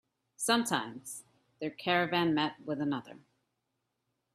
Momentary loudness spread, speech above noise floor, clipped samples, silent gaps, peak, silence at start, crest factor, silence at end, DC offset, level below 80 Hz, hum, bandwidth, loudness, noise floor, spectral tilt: 14 LU; 51 dB; under 0.1%; none; -14 dBFS; 0.4 s; 22 dB; 1.2 s; under 0.1%; -76 dBFS; none; 15.5 kHz; -32 LUFS; -83 dBFS; -3.5 dB/octave